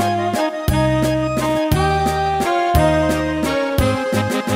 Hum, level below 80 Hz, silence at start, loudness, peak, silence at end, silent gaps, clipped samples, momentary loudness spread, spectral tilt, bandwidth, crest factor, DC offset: none; -30 dBFS; 0 s; -18 LUFS; -2 dBFS; 0 s; none; under 0.1%; 4 LU; -6 dB/octave; 16 kHz; 16 dB; under 0.1%